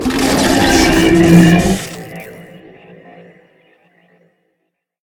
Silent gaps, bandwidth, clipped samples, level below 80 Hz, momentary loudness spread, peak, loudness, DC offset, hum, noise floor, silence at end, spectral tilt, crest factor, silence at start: none; 18 kHz; 0.2%; -32 dBFS; 23 LU; 0 dBFS; -10 LUFS; under 0.1%; none; -70 dBFS; 2.6 s; -5 dB/octave; 14 dB; 0 s